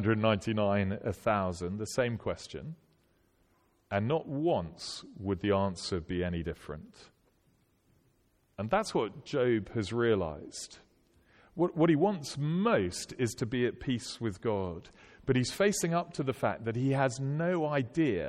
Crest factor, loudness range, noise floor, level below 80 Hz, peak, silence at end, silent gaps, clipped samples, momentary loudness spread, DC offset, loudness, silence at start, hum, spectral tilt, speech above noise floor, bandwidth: 18 dB; 5 LU; -70 dBFS; -58 dBFS; -14 dBFS; 0 s; none; under 0.1%; 13 LU; under 0.1%; -32 LUFS; 0 s; none; -6 dB/octave; 39 dB; 15 kHz